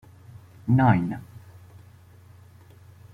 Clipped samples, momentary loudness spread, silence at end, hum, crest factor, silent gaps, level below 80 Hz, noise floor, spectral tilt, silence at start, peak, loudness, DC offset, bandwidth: under 0.1%; 20 LU; 1.75 s; none; 22 dB; none; -58 dBFS; -50 dBFS; -9.5 dB/octave; 0.35 s; -4 dBFS; -23 LUFS; under 0.1%; 4.7 kHz